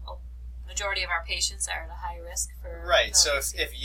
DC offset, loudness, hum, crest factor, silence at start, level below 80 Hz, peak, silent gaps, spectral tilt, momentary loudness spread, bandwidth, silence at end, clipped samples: under 0.1%; -25 LUFS; none; 22 dB; 0 s; -40 dBFS; -6 dBFS; none; -0.5 dB/octave; 20 LU; 17 kHz; 0 s; under 0.1%